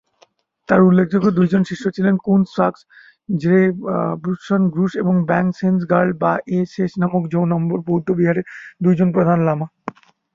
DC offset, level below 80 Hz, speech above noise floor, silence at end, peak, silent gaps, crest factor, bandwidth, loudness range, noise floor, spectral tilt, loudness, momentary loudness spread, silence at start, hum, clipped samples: under 0.1%; -56 dBFS; 40 dB; 0.45 s; -2 dBFS; none; 16 dB; 7.2 kHz; 2 LU; -57 dBFS; -9 dB/octave; -18 LUFS; 7 LU; 0.7 s; none; under 0.1%